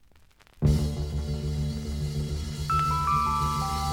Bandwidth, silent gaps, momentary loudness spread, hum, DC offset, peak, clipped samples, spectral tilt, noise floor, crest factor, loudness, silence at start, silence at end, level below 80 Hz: 17.5 kHz; none; 7 LU; none; under 0.1%; -12 dBFS; under 0.1%; -6 dB/octave; -57 dBFS; 16 dB; -28 LUFS; 0.55 s; 0 s; -36 dBFS